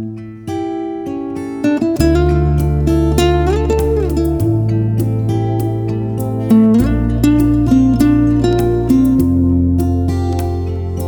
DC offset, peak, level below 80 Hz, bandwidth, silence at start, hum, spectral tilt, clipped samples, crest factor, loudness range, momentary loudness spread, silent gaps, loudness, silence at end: under 0.1%; 0 dBFS; -22 dBFS; 19 kHz; 0 s; none; -8 dB/octave; under 0.1%; 14 dB; 3 LU; 10 LU; none; -14 LUFS; 0 s